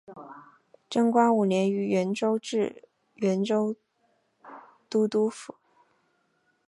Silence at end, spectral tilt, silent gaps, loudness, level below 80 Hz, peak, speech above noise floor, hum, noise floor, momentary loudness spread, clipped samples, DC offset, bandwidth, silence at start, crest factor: 1.25 s; -6.5 dB/octave; none; -26 LUFS; -78 dBFS; -8 dBFS; 46 dB; none; -71 dBFS; 23 LU; under 0.1%; under 0.1%; 11.5 kHz; 0.1 s; 20 dB